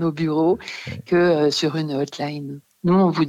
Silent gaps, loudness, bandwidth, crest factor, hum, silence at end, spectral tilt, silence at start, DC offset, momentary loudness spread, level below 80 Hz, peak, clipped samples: none; -21 LUFS; 11 kHz; 14 dB; none; 0 s; -6.5 dB/octave; 0 s; under 0.1%; 14 LU; -60 dBFS; -8 dBFS; under 0.1%